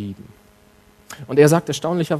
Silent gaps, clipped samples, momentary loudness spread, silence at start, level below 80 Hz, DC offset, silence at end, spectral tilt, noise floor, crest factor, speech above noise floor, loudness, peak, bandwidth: none; under 0.1%; 25 LU; 0 s; -58 dBFS; under 0.1%; 0 s; -6 dB/octave; -52 dBFS; 20 dB; 34 dB; -17 LUFS; 0 dBFS; 13.5 kHz